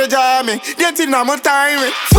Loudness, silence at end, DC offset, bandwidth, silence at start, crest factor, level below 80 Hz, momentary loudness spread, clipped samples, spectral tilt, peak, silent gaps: -14 LUFS; 0 s; under 0.1%; 19.5 kHz; 0 s; 14 dB; -30 dBFS; 3 LU; under 0.1%; -4 dB/octave; 0 dBFS; none